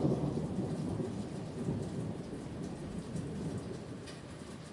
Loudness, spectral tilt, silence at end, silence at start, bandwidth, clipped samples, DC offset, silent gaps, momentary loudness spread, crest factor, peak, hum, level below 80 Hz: -40 LUFS; -7.5 dB/octave; 0 s; 0 s; 11.5 kHz; under 0.1%; under 0.1%; none; 10 LU; 18 dB; -20 dBFS; none; -58 dBFS